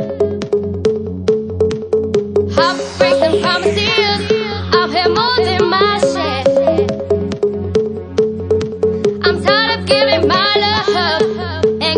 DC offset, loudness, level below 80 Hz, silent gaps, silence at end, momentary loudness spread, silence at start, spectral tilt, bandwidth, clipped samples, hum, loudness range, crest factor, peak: under 0.1%; -14 LUFS; -50 dBFS; none; 0 s; 6 LU; 0 s; -5 dB/octave; 10.5 kHz; under 0.1%; none; 2 LU; 14 dB; 0 dBFS